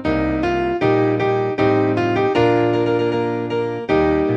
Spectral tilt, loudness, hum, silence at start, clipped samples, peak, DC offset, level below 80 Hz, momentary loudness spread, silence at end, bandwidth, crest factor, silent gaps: -8 dB/octave; -18 LUFS; none; 0 s; under 0.1%; -4 dBFS; under 0.1%; -40 dBFS; 5 LU; 0 s; 7.2 kHz; 12 dB; none